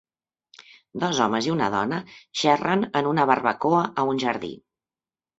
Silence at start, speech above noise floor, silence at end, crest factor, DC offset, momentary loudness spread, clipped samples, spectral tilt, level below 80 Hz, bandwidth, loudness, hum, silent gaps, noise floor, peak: 0.95 s; over 67 dB; 0.85 s; 22 dB; under 0.1%; 11 LU; under 0.1%; -5 dB/octave; -64 dBFS; 8 kHz; -23 LUFS; none; none; under -90 dBFS; -2 dBFS